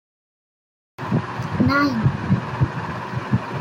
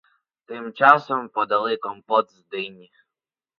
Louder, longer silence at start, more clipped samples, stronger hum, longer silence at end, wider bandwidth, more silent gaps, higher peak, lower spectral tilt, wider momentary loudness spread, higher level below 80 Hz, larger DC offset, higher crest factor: about the same, -22 LUFS vs -21 LUFS; first, 1 s vs 0.5 s; neither; neither; second, 0 s vs 0.85 s; first, 15.5 kHz vs 7 kHz; neither; second, -6 dBFS vs 0 dBFS; first, -7.5 dB/octave vs -6 dB/octave; second, 10 LU vs 19 LU; first, -46 dBFS vs -74 dBFS; neither; second, 18 dB vs 24 dB